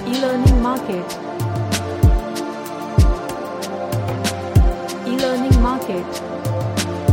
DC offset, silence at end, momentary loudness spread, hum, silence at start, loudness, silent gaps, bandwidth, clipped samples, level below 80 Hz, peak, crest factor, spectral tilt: under 0.1%; 0 s; 10 LU; none; 0 s; -20 LUFS; none; 17 kHz; under 0.1%; -22 dBFS; 0 dBFS; 18 dB; -6 dB/octave